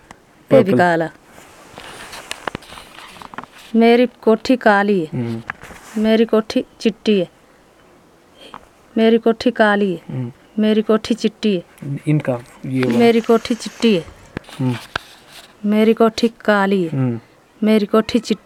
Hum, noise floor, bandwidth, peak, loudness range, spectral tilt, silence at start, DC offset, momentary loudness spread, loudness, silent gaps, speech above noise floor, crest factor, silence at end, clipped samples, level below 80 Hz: none; -50 dBFS; 13.5 kHz; 0 dBFS; 3 LU; -6.5 dB/octave; 0.5 s; under 0.1%; 20 LU; -17 LUFS; none; 34 dB; 18 dB; 0.1 s; under 0.1%; -54 dBFS